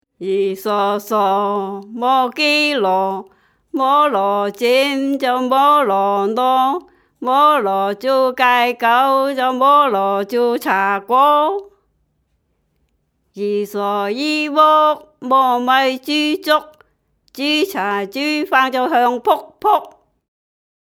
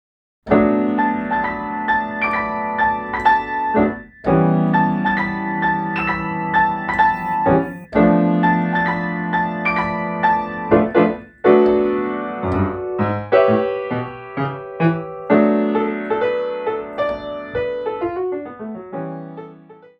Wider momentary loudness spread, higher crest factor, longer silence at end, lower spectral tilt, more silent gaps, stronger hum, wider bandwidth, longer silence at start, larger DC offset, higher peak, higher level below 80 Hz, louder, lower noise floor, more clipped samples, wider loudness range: about the same, 8 LU vs 10 LU; about the same, 16 dB vs 18 dB; first, 0.95 s vs 0.25 s; second, -4 dB/octave vs -9 dB/octave; neither; neither; first, over 20 kHz vs 5.8 kHz; second, 0.2 s vs 0.45 s; neither; about the same, 0 dBFS vs 0 dBFS; second, -68 dBFS vs -46 dBFS; first, -16 LUFS vs -19 LUFS; first, -66 dBFS vs -43 dBFS; neither; about the same, 4 LU vs 3 LU